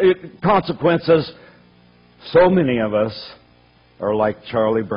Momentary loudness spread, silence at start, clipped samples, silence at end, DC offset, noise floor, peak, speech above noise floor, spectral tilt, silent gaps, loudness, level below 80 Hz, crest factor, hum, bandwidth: 15 LU; 0 s; under 0.1%; 0 s; under 0.1%; -53 dBFS; -4 dBFS; 35 dB; -10.5 dB/octave; none; -18 LUFS; -50 dBFS; 14 dB; 60 Hz at -50 dBFS; 5.4 kHz